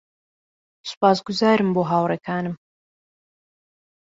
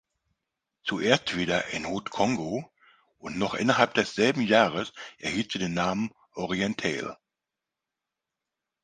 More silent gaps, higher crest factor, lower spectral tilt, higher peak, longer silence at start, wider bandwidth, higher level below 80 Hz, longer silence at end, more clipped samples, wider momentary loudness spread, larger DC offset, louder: first, 0.97-1.01 s vs none; second, 20 dB vs 26 dB; first, -6 dB/octave vs -4.5 dB/octave; about the same, -4 dBFS vs -2 dBFS; about the same, 0.85 s vs 0.85 s; second, 7.8 kHz vs 9.8 kHz; second, -66 dBFS vs -60 dBFS; about the same, 1.6 s vs 1.7 s; neither; first, 17 LU vs 13 LU; neither; first, -21 LUFS vs -27 LUFS